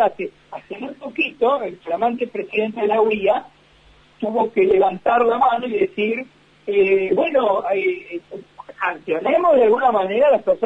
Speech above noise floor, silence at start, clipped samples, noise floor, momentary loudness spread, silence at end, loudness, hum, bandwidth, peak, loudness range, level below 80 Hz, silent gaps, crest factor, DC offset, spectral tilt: 33 dB; 0 s; under 0.1%; -51 dBFS; 15 LU; 0 s; -19 LUFS; none; 7.6 kHz; -6 dBFS; 3 LU; -58 dBFS; none; 14 dB; under 0.1%; -7 dB/octave